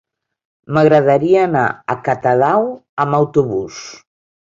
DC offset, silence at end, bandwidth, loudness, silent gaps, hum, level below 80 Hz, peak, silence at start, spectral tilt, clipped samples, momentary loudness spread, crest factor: under 0.1%; 0.55 s; 7.6 kHz; -15 LUFS; 2.89-2.97 s; none; -54 dBFS; 0 dBFS; 0.7 s; -7 dB/octave; under 0.1%; 11 LU; 14 dB